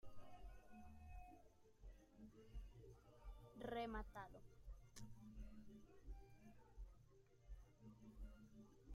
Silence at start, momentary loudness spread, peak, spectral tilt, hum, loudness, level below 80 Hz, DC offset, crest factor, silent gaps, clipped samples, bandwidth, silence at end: 0 s; 15 LU; -36 dBFS; -6 dB/octave; none; -60 LUFS; -62 dBFS; under 0.1%; 22 dB; none; under 0.1%; 15 kHz; 0 s